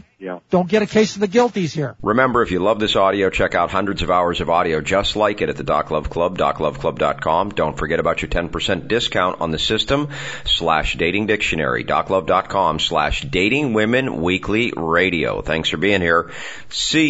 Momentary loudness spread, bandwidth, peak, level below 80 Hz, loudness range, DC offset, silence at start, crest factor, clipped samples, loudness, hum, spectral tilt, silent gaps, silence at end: 5 LU; 8 kHz; -2 dBFS; -36 dBFS; 2 LU; 0.4%; 0.2 s; 18 dB; under 0.1%; -18 LUFS; none; -4.5 dB/octave; none; 0 s